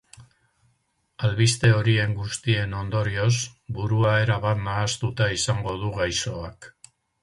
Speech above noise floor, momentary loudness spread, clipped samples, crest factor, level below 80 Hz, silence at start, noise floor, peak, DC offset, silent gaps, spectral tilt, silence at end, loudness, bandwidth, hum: 47 dB; 9 LU; under 0.1%; 18 dB; -46 dBFS; 0.2 s; -70 dBFS; -6 dBFS; under 0.1%; none; -4.5 dB/octave; 0.55 s; -24 LUFS; 11.5 kHz; none